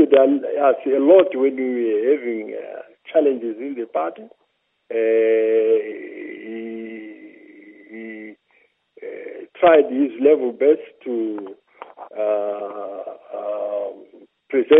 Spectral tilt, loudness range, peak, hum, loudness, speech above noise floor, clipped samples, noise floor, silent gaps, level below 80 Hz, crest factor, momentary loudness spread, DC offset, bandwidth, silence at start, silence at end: -9 dB/octave; 9 LU; 0 dBFS; none; -19 LUFS; 43 dB; under 0.1%; -61 dBFS; none; -72 dBFS; 20 dB; 22 LU; under 0.1%; 3.8 kHz; 0 s; 0 s